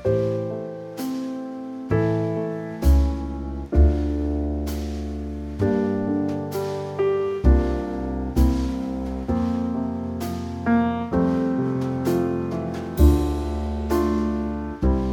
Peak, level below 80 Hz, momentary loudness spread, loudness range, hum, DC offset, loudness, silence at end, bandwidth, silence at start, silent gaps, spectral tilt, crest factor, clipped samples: -4 dBFS; -26 dBFS; 10 LU; 2 LU; none; under 0.1%; -24 LUFS; 0 s; 17.5 kHz; 0 s; none; -8 dB/octave; 18 dB; under 0.1%